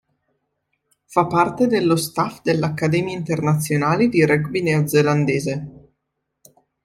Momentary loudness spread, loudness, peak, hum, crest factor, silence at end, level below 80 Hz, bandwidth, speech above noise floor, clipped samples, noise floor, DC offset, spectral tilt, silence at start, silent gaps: 6 LU; -19 LUFS; -2 dBFS; none; 18 dB; 1.15 s; -56 dBFS; 15.5 kHz; 58 dB; under 0.1%; -77 dBFS; under 0.1%; -6 dB/octave; 1.1 s; none